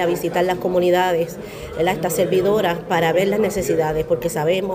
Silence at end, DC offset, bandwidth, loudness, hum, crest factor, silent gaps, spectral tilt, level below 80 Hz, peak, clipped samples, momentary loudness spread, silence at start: 0 s; under 0.1%; 16 kHz; -19 LUFS; none; 12 dB; none; -5 dB/octave; -44 dBFS; -6 dBFS; under 0.1%; 5 LU; 0 s